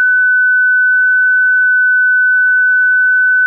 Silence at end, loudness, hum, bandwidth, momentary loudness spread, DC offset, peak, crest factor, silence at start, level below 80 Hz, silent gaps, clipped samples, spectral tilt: 0 s; -9 LUFS; none; 1.7 kHz; 0 LU; under 0.1%; -6 dBFS; 4 dB; 0 s; under -90 dBFS; none; under 0.1%; 9 dB/octave